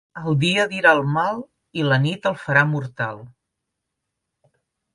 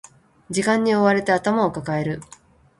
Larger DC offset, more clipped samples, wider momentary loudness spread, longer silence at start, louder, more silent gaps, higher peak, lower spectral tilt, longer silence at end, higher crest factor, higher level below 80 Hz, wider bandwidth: neither; neither; about the same, 12 LU vs 10 LU; second, 0.15 s vs 0.5 s; about the same, -20 LUFS vs -21 LUFS; neither; about the same, -2 dBFS vs -4 dBFS; about the same, -6 dB/octave vs -5.5 dB/octave; first, 1.65 s vs 0.55 s; about the same, 20 dB vs 18 dB; about the same, -60 dBFS vs -56 dBFS; about the same, 11.5 kHz vs 11.5 kHz